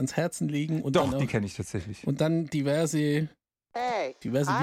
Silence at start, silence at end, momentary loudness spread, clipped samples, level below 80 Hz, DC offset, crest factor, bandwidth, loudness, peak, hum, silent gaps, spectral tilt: 0 s; 0 s; 8 LU; under 0.1%; -56 dBFS; under 0.1%; 18 dB; 15.5 kHz; -29 LUFS; -10 dBFS; none; none; -6 dB/octave